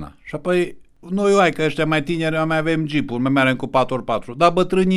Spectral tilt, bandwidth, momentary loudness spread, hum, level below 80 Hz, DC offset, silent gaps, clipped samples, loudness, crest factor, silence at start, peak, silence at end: -6 dB/octave; 12.5 kHz; 9 LU; none; -46 dBFS; under 0.1%; none; under 0.1%; -19 LUFS; 16 dB; 0 s; -2 dBFS; 0 s